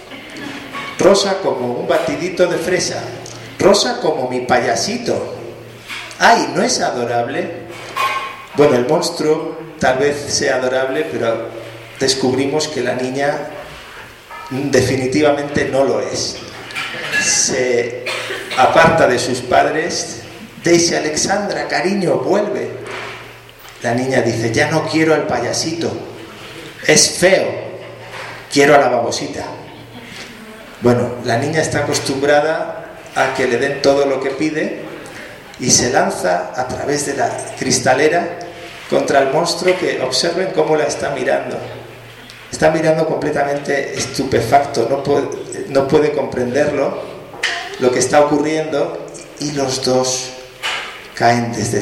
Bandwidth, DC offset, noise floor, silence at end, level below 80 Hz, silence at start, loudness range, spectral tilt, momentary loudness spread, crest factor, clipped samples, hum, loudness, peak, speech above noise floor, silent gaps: 16.5 kHz; under 0.1%; -38 dBFS; 0 s; -48 dBFS; 0 s; 4 LU; -3.5 dB/octave; 18 LU; 16 dB; under 0.1%; none; -16 LUFS; 0 dBFS; 22 dB; none